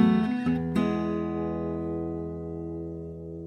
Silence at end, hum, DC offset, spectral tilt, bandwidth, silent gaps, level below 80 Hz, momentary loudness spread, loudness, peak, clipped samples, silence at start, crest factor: 0 s; none; under 0.1%; -8.5 dB/octave; 9.6 kHz; none; -48 dBFS; 10 LU; -30 LUFS; -10 dBFS; under 0.1%; 0 s; 18 dB